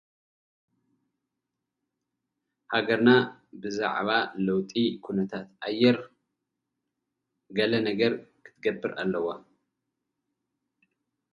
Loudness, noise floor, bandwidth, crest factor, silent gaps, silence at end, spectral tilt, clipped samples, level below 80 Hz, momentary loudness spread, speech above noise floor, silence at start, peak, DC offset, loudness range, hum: -27 LUFS; -85 dBFS; 7.2 kHz; 24 dB; none; 1.95 s; -6.5 dB/octave; under 0.1%; -70 dBFS; 12 LU; 59 dB; 2.7 s; -6 dBFS; under 0.1%; 5 LU; none